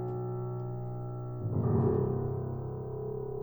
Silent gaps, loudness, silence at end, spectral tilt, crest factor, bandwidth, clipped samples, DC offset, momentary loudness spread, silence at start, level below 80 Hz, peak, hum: none; -34 LUFS; 0 s; -13.5 dB/octave; 16 dB; over 20 kHz; under 0.1%; under 0.1%; 10 LU; 0 s; -54 dBFS; -16 dBFS; none